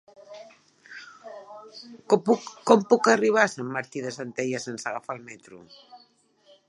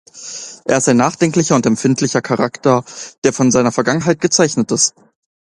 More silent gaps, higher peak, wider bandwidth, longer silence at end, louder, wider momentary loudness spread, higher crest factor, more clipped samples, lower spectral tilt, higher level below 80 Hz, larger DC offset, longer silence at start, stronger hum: second, none vs 3.18-3.22 s; about the same, -2 dBFS vs 0 dBFS; about the same, 11 kHz vs 11.5 kHz; about the same, 0.75 s vs 0.7 s; second, -24 LUFS vs -15 LUFS; first, 25 LU vs 7 LU; first, 24 dB vs 16 dB; neither; about the same, -4.5 dB/octave vs -4.5 dB/octave; second, -78 dBFS vs -54 dBFS; neither; first, 0.3 s vs 0.15 s; neither